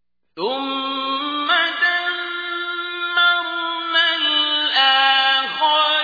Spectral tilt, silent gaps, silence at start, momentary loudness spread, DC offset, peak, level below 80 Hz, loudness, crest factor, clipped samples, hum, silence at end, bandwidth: -2 dB/octave; none; 0.35 s; 10 LU; under 0.1%; -4 dBFS; -72 dBFS; -17 LUFS; 14 dB; under 0.1%; none; 0 s; 5 kHz